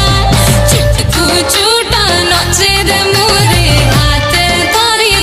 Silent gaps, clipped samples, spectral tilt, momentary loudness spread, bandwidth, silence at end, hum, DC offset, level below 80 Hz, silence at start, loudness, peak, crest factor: none; under 0.1%; -3.5 dB/octave; 2 LU; 16 kHz; 0 s; none; under 0.1%; -18 dBFS; 0 s; -8 LUFS; 0 dBFS; 8 dB